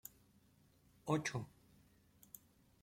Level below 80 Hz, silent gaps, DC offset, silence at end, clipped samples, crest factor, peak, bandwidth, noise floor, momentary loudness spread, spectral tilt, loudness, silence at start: -76 dBFS; none; under 0.1%; 0.45 s; under 0.1%; 22 dB; -24 dBFS; 16.5 kHz; -71 dBFS; 20 LU; -5 dB/octave; -42 LUFS; 0.05 s